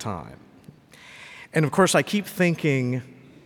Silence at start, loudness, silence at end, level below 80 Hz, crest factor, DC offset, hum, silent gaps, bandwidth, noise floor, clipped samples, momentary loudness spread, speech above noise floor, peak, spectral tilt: 0 s; -23 LUFS; 0.3 s; -62 dBFS; 20 dB; under 0.1%; none; none; 19 kHz; -50 dBFS; under 0.1%; 22 LU; 27 dB; -6 dBFS; -5 dB/octave